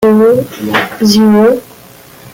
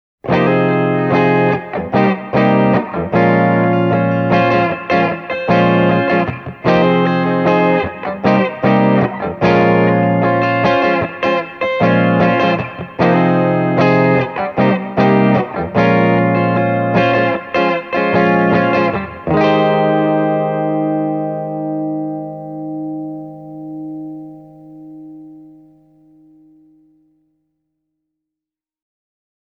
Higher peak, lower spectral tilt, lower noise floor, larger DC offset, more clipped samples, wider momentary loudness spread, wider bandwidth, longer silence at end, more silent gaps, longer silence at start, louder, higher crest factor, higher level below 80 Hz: about the same, 0 dBFS vs 0 dBFS; second, -5.5 dB/octave vs -8.5 dB/octave; second, -36 dBFS vs -86 dBFS; neither; neither; second, 7 LU vs 11 LU; first, 16.5 kHz vs 6.4 kHz; second, 0.05 s vs 4.1 s; neither; second, 0 s vs 0.25 s; first, -9 LUFS vs -14 LUFS; about the same, 10 dB vs 14 dB; about the same, -48 dBFS vs -48 dBFS